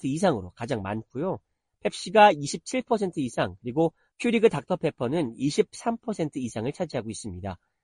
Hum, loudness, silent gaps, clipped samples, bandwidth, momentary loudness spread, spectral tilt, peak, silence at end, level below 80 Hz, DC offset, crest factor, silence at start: none; -27 LUFS; none; under 0.1%; 11.5 kHz; 12 LU; -5.5 dB/octave; -6 dBFS; 0.3 s; -60 dBFS; under 0.1%; 20 dB; 0.05 s